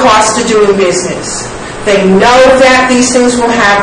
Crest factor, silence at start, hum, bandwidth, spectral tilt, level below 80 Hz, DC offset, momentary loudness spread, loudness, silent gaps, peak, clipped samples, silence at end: 6 dB; 0 s; none; 12 kHz; -3.5 dB/octave; -32 dBFS; under 0.1%; 12 LU; -7 LUFS; none; 0 dBFS; 3%; 0 s